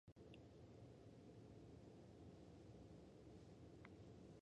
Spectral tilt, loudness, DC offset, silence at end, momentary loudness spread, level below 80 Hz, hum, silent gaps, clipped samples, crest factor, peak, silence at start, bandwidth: -7 dB/octave; -64 LUFS; under 0.1%; 0 s; 1 LU; -74 dBFS; none; 0.12-0.16 s; under 0.1%; 20 dB; -42 dBFS; 0.05 s; 9.4 kHz